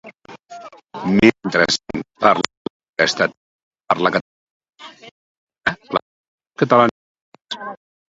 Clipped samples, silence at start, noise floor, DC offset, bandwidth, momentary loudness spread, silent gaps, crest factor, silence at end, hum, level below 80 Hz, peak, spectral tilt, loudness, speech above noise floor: under 0.1%; 0.05 s; -40 dBFS; under 0.1%; 10.5 kHz; 23 LU; 2.57-2.80 s, 3.37-3.71 s, 4.21-4.60 s, 5.11-5.47 s, 6.02-6.38 s, 6.91-7.15 s, 7.21-7.32 s; 20 dB; 0.35 s; none; -54 dBFS; 0 dBFS; -4.5 dB/octave; -18 LUFS; 24 dB